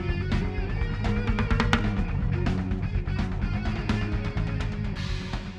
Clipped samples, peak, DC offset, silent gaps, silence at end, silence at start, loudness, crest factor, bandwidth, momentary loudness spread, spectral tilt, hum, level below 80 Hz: under 0.1%; -6 dBFS; under 0.1%; none; 0 s; 0 s; -28 LUFS; 22 dB; 8.8 kHz; 6 LU; -7 dB/octave; none; -30 dBFS